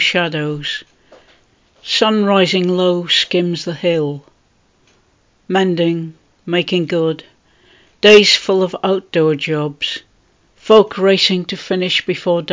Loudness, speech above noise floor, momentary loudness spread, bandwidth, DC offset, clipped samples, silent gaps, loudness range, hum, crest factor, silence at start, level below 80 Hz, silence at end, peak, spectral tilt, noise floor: -14 LUFS; 42 dB; 12 LU; 7.8 kHz; under 0.1%; 0.1%; none; 6 LU; none; 16 dB; 0 s; -58 dBFS; 0 s; 0 dBFS; -4.5 dB/octave; -57 dBFS